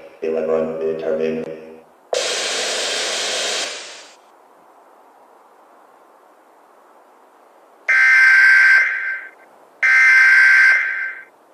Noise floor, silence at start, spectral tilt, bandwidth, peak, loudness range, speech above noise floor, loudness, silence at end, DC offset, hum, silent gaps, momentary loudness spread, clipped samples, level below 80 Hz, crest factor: -50 dBFS; 0.05 s; 0 dB/octave; 15 kHz; -4 dBFS; 14 LU; 29 dB; -14 LUFS; 0.3 s; under 0.1%; none; none; 19 LU; under 0.1%; -68 dBFS; 14 dB